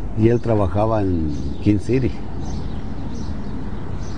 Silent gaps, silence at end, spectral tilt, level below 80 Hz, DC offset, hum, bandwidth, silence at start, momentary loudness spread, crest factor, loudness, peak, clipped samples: none; 0 s; -8.5 dB/octave; -32 dBFS; 6%; none; 9.6 kHz; 0 s; 12 LU; 16 dB; -22 LUFS; -4 dBFS; under 0.1%